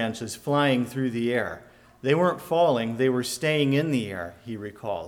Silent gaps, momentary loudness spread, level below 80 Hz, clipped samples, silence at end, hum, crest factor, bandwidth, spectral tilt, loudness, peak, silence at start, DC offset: none; 13 LU; -62 dBFS; under 0.1%; 0 s; none; 16 dB; 18 kHz; -5.5 dB/octave; -25 LUFS; -8 dBFS; 0 s; under 0.1%